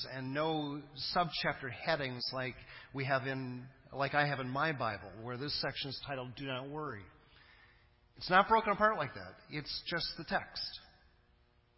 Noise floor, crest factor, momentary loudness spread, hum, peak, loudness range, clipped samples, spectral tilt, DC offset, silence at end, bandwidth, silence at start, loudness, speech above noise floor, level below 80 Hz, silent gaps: -69 dBFS; 24 dB; 14 LU; none; -12 dBFS; 5 LU; under 0.1%; -8 dB/octave; under 0.1%; 0.9 s; 5.8 kHz; 0 s; -36 LUFS; 33 dB; -64 dBFS; none